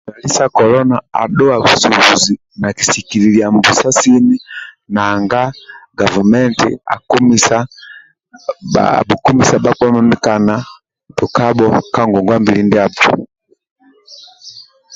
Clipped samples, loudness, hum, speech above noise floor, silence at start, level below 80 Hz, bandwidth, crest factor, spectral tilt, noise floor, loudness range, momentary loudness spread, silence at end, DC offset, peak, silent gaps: under 0.1%; -11 LUFS; none; 28 dB; 0.05 s; -44 dBFS; 8 kHz; 12 dB; -4 dB/octave; -40 dBFS; 3 LU; 11 LU; 0 s; under 0.1%; 0 dBFS; 13.71-13.76 s